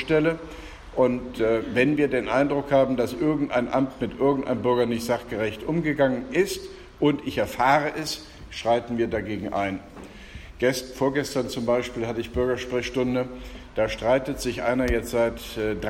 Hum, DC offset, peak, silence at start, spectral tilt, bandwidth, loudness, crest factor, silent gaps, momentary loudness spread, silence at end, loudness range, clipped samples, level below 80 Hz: none; under 0.1%; -6 dBFS; 0 s; -5.5 dB/octave; 16.5 kHz; -25 LUFS; 18 dB; none; 12 LU; 0 s; 4 LU; under 0.1%; -44 dBFS